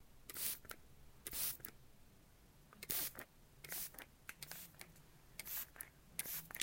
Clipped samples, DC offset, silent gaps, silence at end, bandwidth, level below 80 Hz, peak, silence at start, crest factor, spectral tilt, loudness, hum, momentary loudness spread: under 0.1%; under 0.1%; none; 0 s; 17 kHz; -68 dBFS; -18 dBFS; 0 s; 30 dB; -0.5 dB/octave; -46 LUFS; none; 18 LU